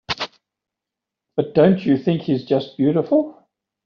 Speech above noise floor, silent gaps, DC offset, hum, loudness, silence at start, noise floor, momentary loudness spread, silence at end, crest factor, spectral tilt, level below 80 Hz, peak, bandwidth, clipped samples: 68 dB; none; under 0.1%; none; -19 LUFS; 0.1 s; -85 dBFS; 11 LU; 0.55 s; 18 dB; -6 dB/octave; -58 dBFS; -2 dBFS; 7 kHz; under 0.1%